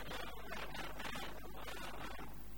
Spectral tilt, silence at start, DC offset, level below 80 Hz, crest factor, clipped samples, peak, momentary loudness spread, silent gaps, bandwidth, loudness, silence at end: -3.5 dB/octave; 0 s; 0.5%; -56 dBFS; 16 dB; under 0.1%; -32 dBFS; 4 LU; none; 19.5 kHz; -48 LUFS; 0 s